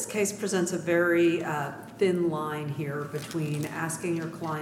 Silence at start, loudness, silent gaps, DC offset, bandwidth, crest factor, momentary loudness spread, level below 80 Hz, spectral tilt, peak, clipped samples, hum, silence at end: 0 s; -28 LUFS; none; under 0.1%; 16 kHz; 16 dB; 9 LU; -68 dBFS; -5 dB/octave; -12 dBFS; under 0.1%; none; 0 s